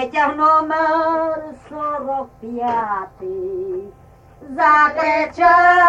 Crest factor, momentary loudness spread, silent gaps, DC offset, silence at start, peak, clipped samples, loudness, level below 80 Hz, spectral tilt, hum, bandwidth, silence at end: 14 dB; 15 LU; none; under 0.1%; 0 s; -2 dBFS; under 0.1%; -17 LUFS; -52 dBFS; -5 dB/octave; none; 8.2 kHz; 0 s